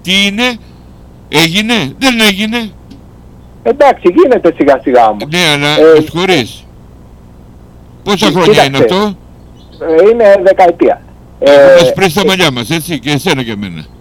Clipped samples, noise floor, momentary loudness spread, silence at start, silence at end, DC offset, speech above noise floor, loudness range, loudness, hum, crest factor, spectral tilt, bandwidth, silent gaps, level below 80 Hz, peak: 2%; -34 dBFS; 12 LU; 0.05 s; 0.15 s; under 0.1%; 27 dB; 5 LU; -8 LUFS; 60 Hz at -40 dBFS; 10 dB; -4.5 dB/octave; 19.5 kHz; none; -38 dBFS; 0 dBFS